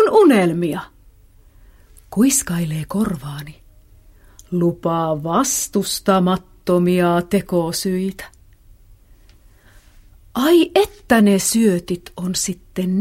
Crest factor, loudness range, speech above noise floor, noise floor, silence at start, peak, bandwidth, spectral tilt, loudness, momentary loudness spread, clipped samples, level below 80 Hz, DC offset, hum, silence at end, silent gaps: 16 dB; 5 LU; 31 dB; -48 dBFS; 0 s; -2 dBFS; 16 kHz; -5 dB/octave; -18 LUFS; 13 LU; under 0.1%; -46 dBFS; under 0.1%; none; 0 s; none